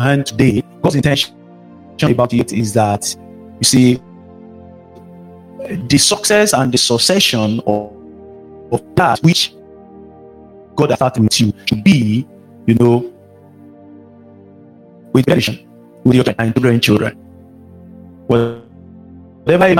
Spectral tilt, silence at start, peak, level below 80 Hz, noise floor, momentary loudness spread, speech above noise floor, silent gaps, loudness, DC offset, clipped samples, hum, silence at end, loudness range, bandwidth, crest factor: -4.5 dB/octave; 0 s; 0 dBFS; -46 dBFS; -42 dBFS; 11 LU; 29 dB; none; -14 LUFS; under 0.1%; under 0.1%; none; 0 s; 4 LU; 16.5 kHz; 16 dB